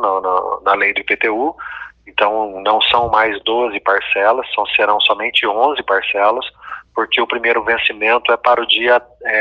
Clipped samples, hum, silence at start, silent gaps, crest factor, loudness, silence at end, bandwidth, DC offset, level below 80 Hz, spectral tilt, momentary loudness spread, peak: under 0.1%; none; 0 s; none; 16 dB; -15 LUFS; 0 s; 7 kHz; under 0.1%; -52 dBFS; -4.5 dB/octave; 9 LU; 0 dBFS